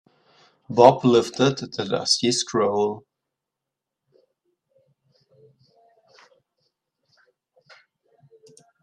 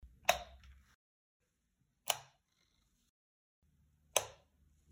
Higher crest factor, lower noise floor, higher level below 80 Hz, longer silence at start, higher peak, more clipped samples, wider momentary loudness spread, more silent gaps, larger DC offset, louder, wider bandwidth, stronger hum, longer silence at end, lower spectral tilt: second, 24 dB vs 36 dB; first, -85 dBFS vs -81 dBFS; about the same, -66 dBFS vs -66 dBFS; first, 0.7 s vs 0.05 s; first, 0 dBFS vs -10 dBFS; neither; second, 12 LU vs 17 LU; second, none vs 0.95-1.40 s, 3.09-3.62 s; neither; first, -20 LUFS vs -38 LUFS; second, 12 kHz vs 16 kHz; neither; first, 5.85 s vs 0.6 s; first, -4.5 dB/octave vs 0 dB/octave